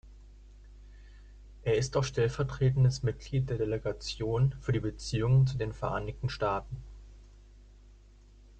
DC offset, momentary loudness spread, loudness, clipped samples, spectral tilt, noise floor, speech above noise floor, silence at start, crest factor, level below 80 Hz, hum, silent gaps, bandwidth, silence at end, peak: under 0.1%; 10 LU; -31 LUFS; under 0.1%; -6.5 dB/octave; -56 dBFS; 26 dB; 0.05 s; 16 dB; -48 dBFS; none; none; 8.8 kHz; 0.7 s; -16 dBFS